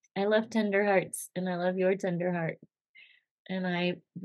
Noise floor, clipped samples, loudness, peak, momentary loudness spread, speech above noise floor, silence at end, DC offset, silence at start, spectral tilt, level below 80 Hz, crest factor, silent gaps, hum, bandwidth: -60 dBFS; under 0.1%; -30 LUFS; -12 dBFS; 9 LU; 30 dB; 0 s; under 0.1%; 0.15 s; -5.5 dB/octave; -88 dBFS; 18 dB; 2.81-2.94 s, 3.31-3.45 s; none; 12.5 kHz